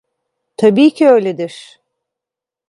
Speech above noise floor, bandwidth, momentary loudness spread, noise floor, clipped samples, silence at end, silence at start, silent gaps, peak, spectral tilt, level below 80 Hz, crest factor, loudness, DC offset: 74 dB; 11.5 kHz; 14 LU; -86 dBFS; under 0.1%; 1.1 s; 0.6 s; none; 0 dBFS; -6.5 dB/octave; -66 dBFS; 14 dB; -11 LUFS; under 0.1%